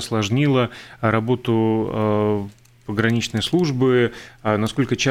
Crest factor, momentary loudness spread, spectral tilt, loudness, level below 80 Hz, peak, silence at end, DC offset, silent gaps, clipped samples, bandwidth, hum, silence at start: 16 dB; 8 LU; -6 dB/octave; -20 LUFS; -50 dBFS; -4 dBFS; 0 s; under 0.1%; none; under 0.1%; 15 kHz; none; 0 s